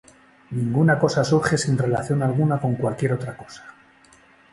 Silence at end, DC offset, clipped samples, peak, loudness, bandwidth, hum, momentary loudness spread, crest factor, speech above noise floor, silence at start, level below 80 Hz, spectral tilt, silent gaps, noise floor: 0.8 s; under 0.1%; under 0.1%; -4 dBFS; -21 LUFS; 11.5 kHz; none; 15 LU; 18 dB; 32 dB; 0.5 s; -54 dBFS; -6.5 dB/octave; none; -53 dBFS